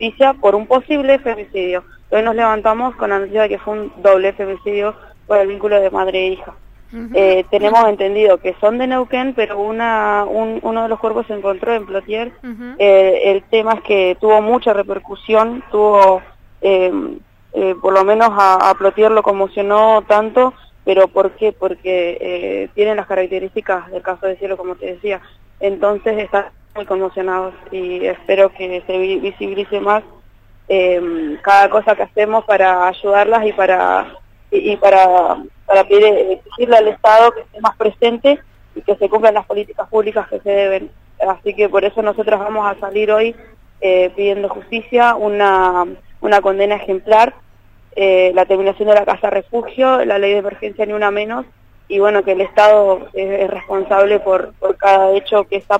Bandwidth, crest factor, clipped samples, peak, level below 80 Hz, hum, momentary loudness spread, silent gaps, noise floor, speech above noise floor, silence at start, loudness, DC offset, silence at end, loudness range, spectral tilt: 9.2 kHz; 14 dB; under 0.1%; 0 dBFS; -46 dBFS; none; 11 LU; none; -44 dBFS; 30 dB; 0 s; -14 LUFS; under 0.1%; 0 s; 6 LU; -5.5 dB/octave